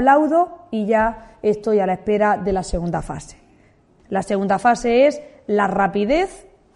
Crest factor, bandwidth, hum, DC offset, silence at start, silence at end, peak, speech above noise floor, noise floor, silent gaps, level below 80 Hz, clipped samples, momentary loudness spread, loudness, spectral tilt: 18 dB; 11.5 kHz; none; under 0.1%; 0 s; 0.35 s; -2 dBFS; 35 dB; -54 dBFS; none; -40 dBFS; under 0.1%; 10 LU; -19 LUFS; -6 dB/octave